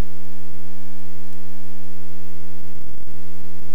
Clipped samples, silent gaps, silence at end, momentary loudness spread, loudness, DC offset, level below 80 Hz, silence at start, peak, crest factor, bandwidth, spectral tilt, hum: under 0.1%; none; 0 s; 1 LU; -41 LUFS; 40%; -56 dBFS; 0 s; -6 dBFS; 16 dB; over 20 kHz; -7 dB/octave; none